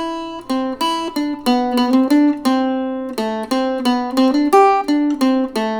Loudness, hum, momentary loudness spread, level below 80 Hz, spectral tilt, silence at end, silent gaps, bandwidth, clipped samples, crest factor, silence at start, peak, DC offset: -17 LUFS; none; 10 LU; -52 dBFS; -4 dB/octave; 0 s; none; 19.5 kHz; under 0.1%; 14 dB; 0 s; -2 dBFS; under 0.1%